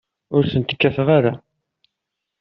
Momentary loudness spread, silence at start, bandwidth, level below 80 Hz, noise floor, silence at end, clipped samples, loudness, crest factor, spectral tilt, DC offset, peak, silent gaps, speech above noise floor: 7 LU; 0.3 s; 5.8 kHz; -54 dBFS; -81 dBFS; 1.05 s; under 0.1%; -18 LUFS; 18 dB; -5.5 dB/octave; under 0.1%; -2 dBFS; none; 64 dB